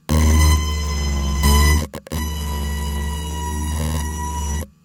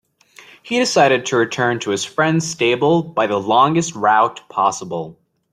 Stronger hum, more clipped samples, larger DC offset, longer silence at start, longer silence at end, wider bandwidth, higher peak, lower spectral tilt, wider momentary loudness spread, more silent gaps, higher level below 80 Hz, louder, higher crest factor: neither; neither; neither; second, 0.1 s vs 0.65 s; second, 0.2 s vs 0.4 s; first, 17.5 kHz vs 13 kHz; about the same, -4 dBFS vs -2 dBFS; about the same, -4.5 dB/octave vs -4.5 dB/octave; first, 11 LU vs 7 LU; neither; first, -22 dBFS vs -60 dBFS; second, -20 LUFS vs -17 LUFS; about the same, 16 dB vs 16 dB